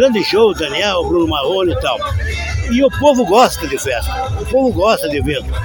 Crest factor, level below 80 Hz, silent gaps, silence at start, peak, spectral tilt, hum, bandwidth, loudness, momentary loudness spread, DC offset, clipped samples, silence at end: 14 dB; -26 dBFS; none; 0 s; 0 dBFS; -5 dB/octave; none; 17.5 kHz; -15 LUFS; 8 LU; under 0.1%; under 0.1%; 0 s